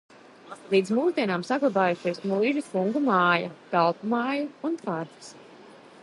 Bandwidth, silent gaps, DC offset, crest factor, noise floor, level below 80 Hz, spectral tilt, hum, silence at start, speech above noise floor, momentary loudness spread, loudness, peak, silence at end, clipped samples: 11.5 kHz; none; under 0.1%; 20 dB; -49 dBFS; -78 dBFS; -6 dB/octave; none; 0.45 s; 24 dB; 11 LU; -25 LUFS; -8 dBFS; 0.35 s; under 0.1%